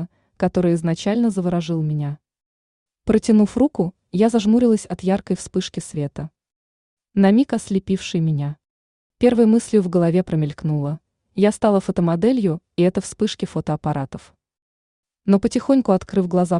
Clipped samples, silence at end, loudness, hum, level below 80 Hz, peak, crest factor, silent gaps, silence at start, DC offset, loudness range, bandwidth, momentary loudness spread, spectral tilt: under 0.1%; 0 s; -20 LUFS; none; -50 dBFS; -4 dBFS; 16 dB; 2.46-2.86 s, 6.56-6.97 s, 8.70-9.10 s, 14.62-15.03 s; 0 s; under 0.1%; 3 LU; 11 kHz; 12 LU; -7 dB/octave